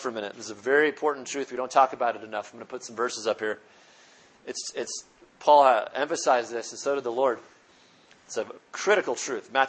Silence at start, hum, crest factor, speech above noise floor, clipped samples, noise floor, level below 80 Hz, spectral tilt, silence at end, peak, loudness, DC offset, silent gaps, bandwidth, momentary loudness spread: 0 s; none; 22 dB; 32 dB; under 0.1%; -58 dBFS; -80 dBFS; -2 dB/octave; 0 s; -6 dBFS; -26 LUFS; under 0.1%; none; 8.8 kHz; 15 LU